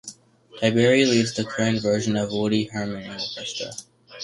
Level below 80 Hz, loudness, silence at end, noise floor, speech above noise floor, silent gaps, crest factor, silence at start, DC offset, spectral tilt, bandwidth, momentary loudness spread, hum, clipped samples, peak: -58 dBFS; -23 LUFS; 0 s; -48 dBFS; 25 dB; none; 20 dB; 0.05 s; under 0.1%; -5 dB/octave; 11.5 kHz; 13 LU; none; under 0.1%; -4 dBFS